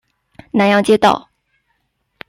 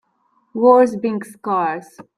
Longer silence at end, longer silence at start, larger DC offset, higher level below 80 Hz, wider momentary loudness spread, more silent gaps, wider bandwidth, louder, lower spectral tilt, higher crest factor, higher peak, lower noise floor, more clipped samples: first, 1.1 s vs 0.15 s; about the same, 0.55 s vs 0.55 s; neither; first, -54 dBFS vs -66 dBFS; second, 10 LU vs 16 LU; neither; about the same, 13 kHz vs 12.5 kHz; first, -14 LUFS vs -17 LUFS; second, -5.5 dB/octave vs -7 dB/octave; about the same, 16 dB vs 18 dB; about the same, 0 dBFS vs -2 dBFS; first, -67 dBFS vs -63 dBFS; neither